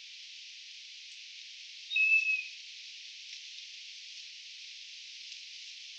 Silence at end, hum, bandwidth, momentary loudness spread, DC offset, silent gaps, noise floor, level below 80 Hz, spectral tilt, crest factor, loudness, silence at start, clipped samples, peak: 0 s; none; 9 kHz; 20 LU; under 0.1%; none; -49 dBFS; under -90 dBFS; 10.5 dB/octave; 20 dB; -33 LUFS; 0 s; under 0.1%; -18 dBFS